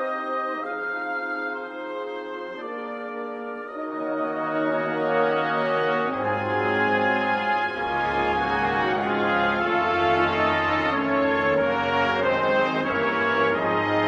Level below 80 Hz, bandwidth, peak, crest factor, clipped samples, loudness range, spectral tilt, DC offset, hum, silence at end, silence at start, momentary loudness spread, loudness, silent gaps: -54 dBFS; 8.2 kHz; -8 dBFS; 14 dB; under 0.1%; 9 LU; -6.5 dB/octave; under 0.1%; none; 0 s; 0 s; 11 LU; -24 LUFS; none